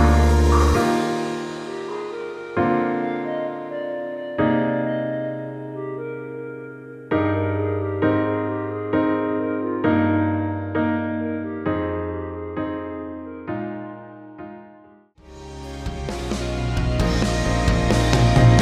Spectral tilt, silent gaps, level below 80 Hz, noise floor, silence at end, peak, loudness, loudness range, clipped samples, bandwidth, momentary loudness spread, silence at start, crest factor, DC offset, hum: -6.5 dB/octave; none; -28 dBFS; -50 dBFS; 0 s; -4 dBFS; -23 LUFS; 10 LU; under 0.1%; 14 kHz; 16 LU; 0 s; 18 dB; under 0.1%; none